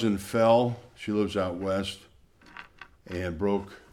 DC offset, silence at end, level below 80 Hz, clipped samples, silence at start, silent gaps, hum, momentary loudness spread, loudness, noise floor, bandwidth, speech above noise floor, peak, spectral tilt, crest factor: under 0.1%; 0.15 s; -56 dBFS; under 0.1%; 0 s; none; none; 23 LU; -28 LUFS; -53 dBFS; 16 kHz; 26 dB; -8 dBFS; -6.5 dB/octave; 20 dB